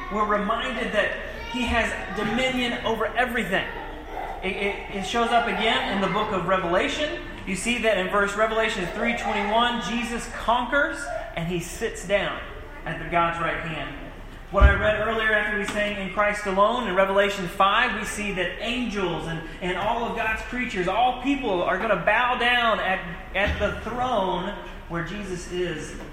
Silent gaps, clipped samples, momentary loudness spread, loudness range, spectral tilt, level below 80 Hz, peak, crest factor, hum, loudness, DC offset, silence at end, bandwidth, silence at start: none; under 0.1%; 11 LU; 4 LU; -4.5 dB/octave; -36 dBFS; -2 dBFS; 22 dB; none; -24 LUFS; under 0.1%; 0 s; 16 kHz; 0 s